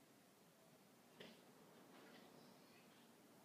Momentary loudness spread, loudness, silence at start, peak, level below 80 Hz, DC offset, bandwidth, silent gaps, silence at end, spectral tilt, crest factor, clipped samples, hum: 7 LU; -66 LUFS; 0 s; -44 dBFS; under -90 dBFS; under 0.1%; 15.5 kHz; none; 0 s; -3.5 dB/octave; 22 dB; under 0.1%; none